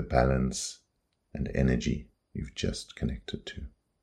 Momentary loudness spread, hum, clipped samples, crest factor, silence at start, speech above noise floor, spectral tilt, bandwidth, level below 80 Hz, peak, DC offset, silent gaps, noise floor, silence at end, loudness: 18 LU; none; under 0.1%; 22 dB; 0 s; 46 dB; -5.5 dB/octave; 12.5 kHz; -40 dBFS; -10 dBFS; under 0.1%; none; -76 dBFS; 0.35 s; -32 LUFS